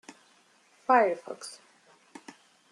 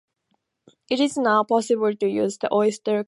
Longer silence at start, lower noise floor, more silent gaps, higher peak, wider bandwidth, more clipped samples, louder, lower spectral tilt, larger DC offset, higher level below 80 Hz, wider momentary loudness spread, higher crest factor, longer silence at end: about the same, 0.9 s vs 0.9 s; second, -63 dBFS vs -73 dBFS; neither; second, -10 dBFS vs -6 dBFS; about the same, 12 kHz vs 11.5 kHz; neither; second, -26 LUFS vs -22 LUFS; about the same, -3.5 dB/octave vs -4.5 dB/octave; neither; second, under -90 dBFS vs -72 dBFS; first, 26 LU vs 4 LU; first, 22 dB vs 16 dB; first, 1.2 s vs 0.05 s